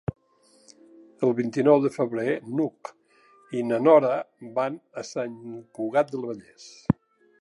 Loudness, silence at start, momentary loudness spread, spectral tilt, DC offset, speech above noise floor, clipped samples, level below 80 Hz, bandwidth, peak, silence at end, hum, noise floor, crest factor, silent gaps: -25 LUFS; 0.1 s; 18 LU; -7.5 dB/octave; under 0.1%; 37 dB; under 0.1%; -56 dBFS; 11.5 kHz; -4 dBFS; 0.5 s; none; -61 dBFS; 22 dB; none